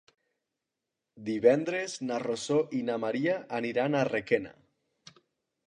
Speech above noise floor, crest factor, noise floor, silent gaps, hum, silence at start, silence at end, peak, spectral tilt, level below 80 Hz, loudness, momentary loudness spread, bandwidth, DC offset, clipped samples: 58 dB; 22 dB; -87 dBFS; none; none; 1.15 s; 1.15 s; -8 dBFS; -5.5 dB/octave; -74 dBFS; -29 LUFS; 9 LU; 10.5 kHz; under 0.1%; under 0.1%